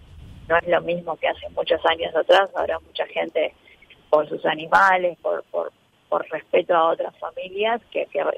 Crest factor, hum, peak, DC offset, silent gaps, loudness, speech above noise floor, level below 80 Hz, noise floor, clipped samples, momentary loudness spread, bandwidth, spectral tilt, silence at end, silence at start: 18 dB; none; -4 dBFS; under 0.1%; none; -22 LUFS; 30 dB; -54 dBFS; -52 dBFS; under 0.1%; 10 LU; 9.8 kHz; -4.5 dB/octave; 0 s; 0.15 s